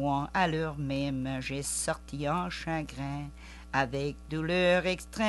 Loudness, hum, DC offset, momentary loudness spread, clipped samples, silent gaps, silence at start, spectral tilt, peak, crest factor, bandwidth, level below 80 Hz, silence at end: -31 LUFS; none; under 0.1%; 11 LU; under 0.1%; none; 0 s; -4.5 dB/octave; -12 dBFS; 18 dB; 12.5 kHz; -48 dBFS; 0 s